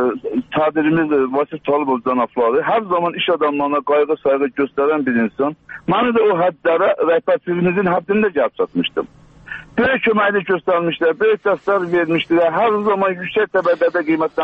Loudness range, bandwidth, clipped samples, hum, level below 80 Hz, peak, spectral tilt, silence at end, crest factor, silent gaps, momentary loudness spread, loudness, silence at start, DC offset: 2 LU; 5.2 kHz; under 0.1%; none; -56 dBFS; -2 dBFS; -8 dB/octave; 0 s; 14 dB; none; 5 LU; -17 LUFS; 0 s; under 0.1%